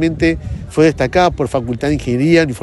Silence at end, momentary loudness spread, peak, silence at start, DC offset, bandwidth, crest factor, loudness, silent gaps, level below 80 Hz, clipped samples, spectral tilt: 0 s; 6 LU; 0 dBFS; 0 s; under 0.1%; 11.5 kHz; 14 dB; -15 LUFS; none; -32 dBFS; under 0.1%; -6.5 dB/octave